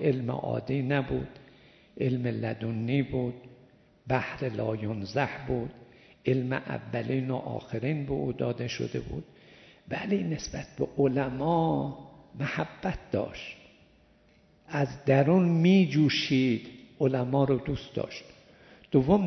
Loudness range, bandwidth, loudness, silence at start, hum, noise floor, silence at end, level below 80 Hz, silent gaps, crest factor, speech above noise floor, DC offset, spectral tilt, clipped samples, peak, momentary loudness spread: 7 LU; 6.4 kHz; -29 LUFS; 0 s; none; -62 dBFS; 0 s; -54 dBFS; none; 20 dB; 34 dB; under 0.1%; -7 dB/octave; under 0.1%; -8 dBFS; 13 LU